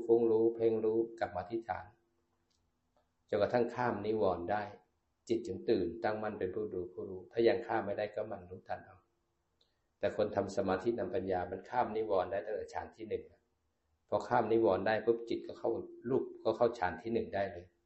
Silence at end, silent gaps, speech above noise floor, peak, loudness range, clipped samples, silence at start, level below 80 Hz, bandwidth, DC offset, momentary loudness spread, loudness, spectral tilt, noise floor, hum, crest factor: 0.2 s; none; 46 dB; -16 dBFS; 4 LU; under 0.1%; 0 s; -64 dBFS; 8.2 kHz; under 0.1%; 12 LU; -35 LUFS; -7 dB/octave; -81 dBFS; none; 20 dB